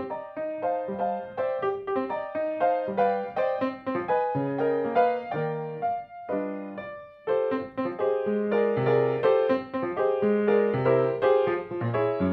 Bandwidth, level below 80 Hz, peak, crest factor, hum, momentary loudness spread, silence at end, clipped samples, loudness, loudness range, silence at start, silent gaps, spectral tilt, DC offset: 5.4 kHz; -68 dBFS; -10 dBFS; 16 dB; none; 9 LU; 0 s; under 0.1%; -27 LUFS; 5 LU; 0 s; none; -9.5 dB/octave; under 0.1%